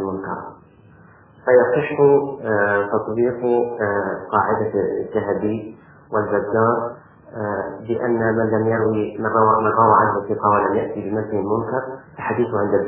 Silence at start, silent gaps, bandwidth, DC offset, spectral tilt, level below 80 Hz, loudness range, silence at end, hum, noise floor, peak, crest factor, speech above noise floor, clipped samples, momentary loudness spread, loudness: 0 s; none; 3.7 kHz; under 0.1%; -11.5 dB/octave; -52 dBFS; 4 LU; 0 s; none; -48 dBFS; -2 dBFS; 18 dB; 29 dB; under 0.1%; 12 LU; -19 LUFS